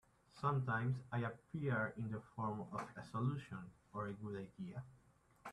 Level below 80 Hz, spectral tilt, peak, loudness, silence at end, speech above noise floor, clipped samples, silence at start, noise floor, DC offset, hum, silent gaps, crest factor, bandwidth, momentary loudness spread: -72 dBFS; -8 dB/octave; -26 dBFS; -44 LUFS; 0 s; 24 dB; under 0.1%; 0.35 s; -67 dBFS; under 0.1%; none; none; 18 dB; 10.5 kHz; 12 LU